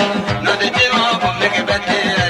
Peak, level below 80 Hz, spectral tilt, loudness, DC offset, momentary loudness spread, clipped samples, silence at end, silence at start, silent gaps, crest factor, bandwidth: -2 dBFS; -42 dBFS; -4 dB/octave; -15 LUFS; under 0.1%; 4 LU; under 0.1%; 0 s; 0 s; none; 14 dB; 15 kHz